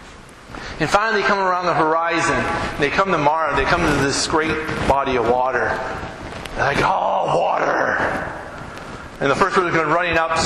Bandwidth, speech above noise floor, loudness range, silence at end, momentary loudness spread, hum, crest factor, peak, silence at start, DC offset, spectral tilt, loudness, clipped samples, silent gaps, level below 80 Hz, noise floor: 14 kHz; 22 dB; 2 LU; 0 s; 14 LU; none; 16 dB; -4 dBFS; 0 s; under 0.1%; -4 dB/octave; -18 LUFS; under 0.1%; none; -38 dBFS; -40 dBFS